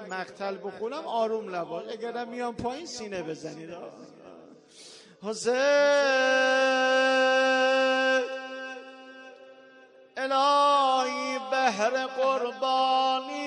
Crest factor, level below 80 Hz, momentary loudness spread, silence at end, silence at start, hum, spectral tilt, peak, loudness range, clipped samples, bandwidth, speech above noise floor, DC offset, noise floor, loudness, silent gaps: 16 dB; -70 dBFS; 17 LU; 0 s; 0 s; none; -2.5 dB/octave; -10 dBFS; 13 LU; under 0.1%; 10.5 kHz; 26 dB; under 0.1%; -54 dBFS; -26 LUFS; none